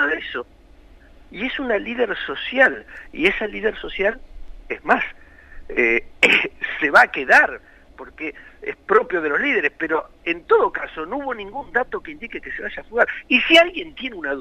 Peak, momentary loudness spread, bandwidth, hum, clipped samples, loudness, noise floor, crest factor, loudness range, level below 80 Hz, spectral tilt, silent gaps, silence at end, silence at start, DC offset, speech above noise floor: -2 dBFS; 17 LU; 15.5 kHz; none; under 0.1%; -19 LUFS; -47 dBFS; 20 dB; 5 LU; -46 dBFS; -3.5 dB/octave; none; 0 s; 0 s; under 0.1%; 26 dB